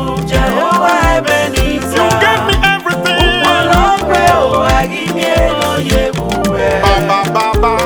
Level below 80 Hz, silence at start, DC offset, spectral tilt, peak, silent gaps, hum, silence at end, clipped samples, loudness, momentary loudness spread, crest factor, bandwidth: -22 dBFS; 0 s; 0.2%; -4.5 dB/octave; 0 dBFS; none; none; 0 s; under 0.1%; -11 LUFS; 4 LU; 12 dB; over 20 kHz